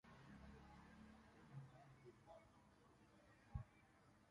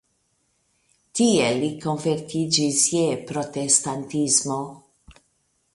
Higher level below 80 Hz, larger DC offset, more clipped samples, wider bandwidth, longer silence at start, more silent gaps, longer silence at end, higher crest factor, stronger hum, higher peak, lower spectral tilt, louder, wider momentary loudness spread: second, -70 dBFS vs -62 dBFS; neither; neither; about the same, 11 kHz vs 11.5 kHz; second, 0.05 s vs 1.15 s; neither; second, 0 s vs 0.6 s; about the same, 26 dB vs 22 dB; neither; second, -38 dBFS vs -4 dBFS; first, -7 dB/octave vs -3.5 dB/octave; second, -63 LUFS vs -22 LUFS; about the same, 9 LU vs 10 LU